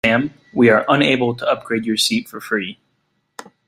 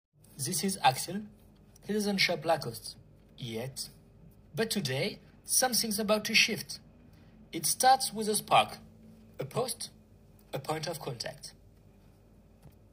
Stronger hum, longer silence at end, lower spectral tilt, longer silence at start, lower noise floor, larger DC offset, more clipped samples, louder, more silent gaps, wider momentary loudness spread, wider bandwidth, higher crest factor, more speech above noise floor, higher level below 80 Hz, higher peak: neither; first, 0.95 s vs 0.25 s; first, -4.5 dB/octave vs -2.5 dB/octave; second, 0.05 s vs 0.35 s; first, -68 dBFS vs -59 dBFS; neither; neither; first, -17 LUFS vs -30 LUFS; neither; second, 10 LU vs 19 LU; about the same, 16 kHz vs 16 kHz; second, 16 dB vs 24 dB; first, 50 dB vs 28 dB; first, -56 dBFS vs -64 dBFS; first, -2 dBFS vs -10 dBFS